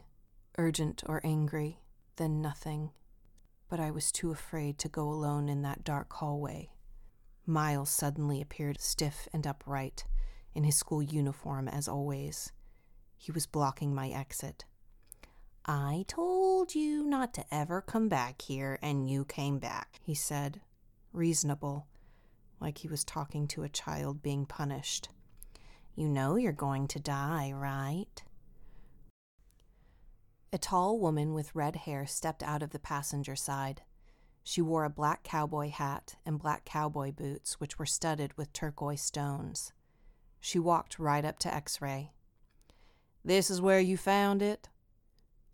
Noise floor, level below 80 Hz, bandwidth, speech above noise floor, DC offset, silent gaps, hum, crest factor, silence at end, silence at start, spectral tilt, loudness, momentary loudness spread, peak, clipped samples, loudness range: -67 dBFS; -52 dBFS; 18.5 kHz; 33 dB; under 0.1%; 29.10-29.38 s; none; 22 dB; 0.9 s; 0.05 s; -5 dB/octave; -34 LUFS; 11 LU; -14 dBFS; under 0.1%; 5 LU